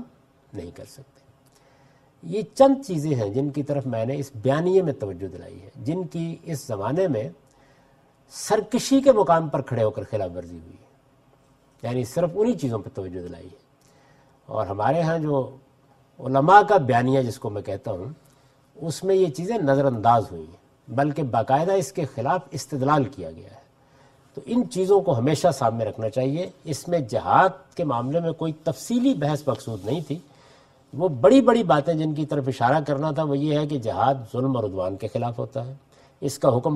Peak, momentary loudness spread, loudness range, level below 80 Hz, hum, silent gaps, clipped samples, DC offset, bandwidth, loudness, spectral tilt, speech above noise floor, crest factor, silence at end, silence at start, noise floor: 0 dBFS; 17 LU; 7 LU; -58 dBFS; none; none; under 0.1%; under 0.1%; 14 kHz; -23 LUFS; -6.5 dB/octave; 36 dB; 22 dB; 0 s; 0 s; -58 dBFS